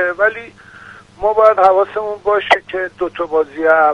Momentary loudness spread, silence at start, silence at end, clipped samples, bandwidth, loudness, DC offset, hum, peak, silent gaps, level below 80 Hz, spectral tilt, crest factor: 11 LU; 0 s; 0 s; under 0.1%; 9.8 kHz; -15 LUFS; under 0.1%; none; 0 dBFS; none; -50 dBFS; -4.5 dB/octave; 14 dB